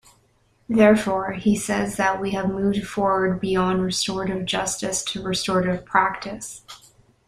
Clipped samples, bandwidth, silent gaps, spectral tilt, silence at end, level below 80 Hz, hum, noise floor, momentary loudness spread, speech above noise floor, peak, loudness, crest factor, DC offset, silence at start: under 0.1%; 15.5 kHz; none; -4.5 dB/octave; 0.5 s; -50 dBFS; none; -62 dBFS; 8 LU; 40 dB; -2 dBFS; -22 LUFS; 20 dB; under 0.1%; 0.7 s